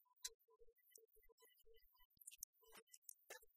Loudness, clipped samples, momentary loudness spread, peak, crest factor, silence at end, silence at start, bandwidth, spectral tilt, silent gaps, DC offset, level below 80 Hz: -60 LUFS; under 0.1%; 13 LU; -32 dBFS; 32 dB; 0 s; 0 s; 15.5 kHz; 1.5 dB/octave; 0.34-0.40 s, 1.32-1.38 s, 2.05-2.10 s, 2.44-2.53 s, 2.82-2.87 s, 2.97-3.02 s; under 0.1%; -84 dBFS